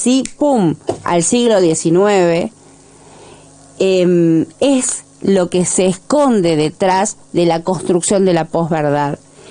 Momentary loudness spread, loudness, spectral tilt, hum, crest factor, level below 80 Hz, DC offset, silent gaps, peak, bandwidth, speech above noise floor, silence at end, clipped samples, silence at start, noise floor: 6 LU; -14 LUFS; -5 dB/octave; none; 12 dB; -50 dBFS; under 0.1%; none; -2 dBFS; 10.5 kHz; 29 dB; 0 s; under 0.1%; 0 s; -43 dBFS